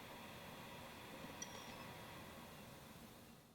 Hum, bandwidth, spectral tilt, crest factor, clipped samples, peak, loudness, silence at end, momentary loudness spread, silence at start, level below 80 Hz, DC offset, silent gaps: none; over 20 kHz; -3.5 dB/octave; 22 dB; under 0.1%; -34 dBFS; -54 LUFS; 0 s; 7 LU; 0 s; -74 dBFS; under 0.1%; none